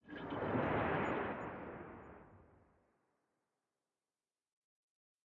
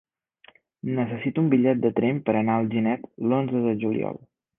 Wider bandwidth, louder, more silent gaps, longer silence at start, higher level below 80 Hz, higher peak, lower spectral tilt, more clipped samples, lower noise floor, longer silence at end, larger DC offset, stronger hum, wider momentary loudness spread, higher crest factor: first, 7 kHz vs 3.7 kHz; second, -40 LUFS vs -24 LUFS; neither; second, 0.05 s vs 0.85 s; about the same, -66 dBFS vs -64 dBFS; second, -26 dBFS vs -8 dBFS; second, -5.5 dB/octave vs -11.5 dB/octave; neither; first, under -90 dBFS vs -57 dBFS; first, 2.85 s vs 0.4 s; neither; neither; first, 19 LU vs 9 LU; about the same, 20 dB vs 18 dB